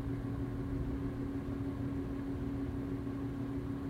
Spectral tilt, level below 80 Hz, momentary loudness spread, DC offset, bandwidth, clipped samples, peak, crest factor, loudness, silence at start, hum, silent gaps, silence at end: -9 dB/octave; -46 dBFS; 1 LU; under 0.1%; 14.5 kHz; under 0.1%; -26 dBFS; 12 dB; -39 LUFS; 0 s; none; none; 0 s